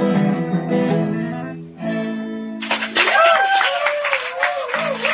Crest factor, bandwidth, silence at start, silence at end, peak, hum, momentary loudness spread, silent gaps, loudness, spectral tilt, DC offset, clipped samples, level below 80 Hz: 16 dB; 4 kHz; 0 s; 0 s; -2 dBFS; none; 14 LU; none; -18 LUFS; -9 dB/octave; under 0.1%; under 0.1%; -60 dBFS